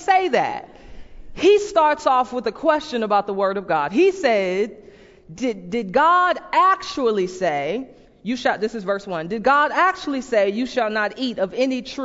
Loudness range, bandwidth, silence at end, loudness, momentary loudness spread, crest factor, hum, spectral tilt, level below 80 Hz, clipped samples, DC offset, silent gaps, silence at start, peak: 2 LU; 8 kHz; 0 s; -20 LUFS; 10 LU; 16 dB; none; -4.5 dB/octave; -52 dBFS; under 0.1%; under 0.1%; none; 0 s; -4 dBFS